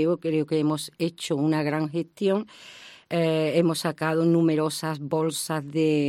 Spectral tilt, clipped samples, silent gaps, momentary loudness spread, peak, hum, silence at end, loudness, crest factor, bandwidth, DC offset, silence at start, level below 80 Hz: -6 dB/octave; under 0.1%; none; 8 LU; -10 dBFS; none; 0 s; -25 LUFS; 16 dB; 15.5 kHz; under 0.1%; 0 s; -72 dBFS